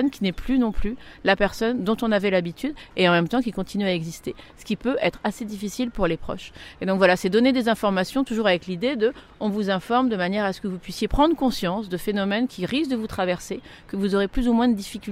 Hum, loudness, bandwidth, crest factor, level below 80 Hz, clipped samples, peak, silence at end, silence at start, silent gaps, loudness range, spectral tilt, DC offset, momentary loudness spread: none; -23 LUFS; 16 kHz; 20 dB; -40 dBFS; under 0.1%; -4 dBFS; 0 s; 0 s; none; 3 LU; -5.5 dB/octave; under 0.1%; 12 LU